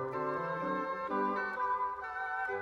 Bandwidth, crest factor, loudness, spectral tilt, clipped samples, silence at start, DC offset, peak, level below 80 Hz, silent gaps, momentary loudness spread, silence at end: 7.4 kHz; 14 dB; -35 LUFS; -7 dB/octave; under 0.1%; 0 s; under 0.1%; -22 dBFS; -68 dBFS; none; 3 LU; 0 s